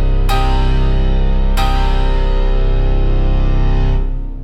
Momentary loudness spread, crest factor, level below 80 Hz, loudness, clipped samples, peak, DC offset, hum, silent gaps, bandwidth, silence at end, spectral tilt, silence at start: 2 LU; 8 dB; -12 dBFS; -17 LUFS; under 0.1%; -4 dBFS; under 0.1%; none; none; 8.2 kHz; 0 s; -7 dB/octave; 0 s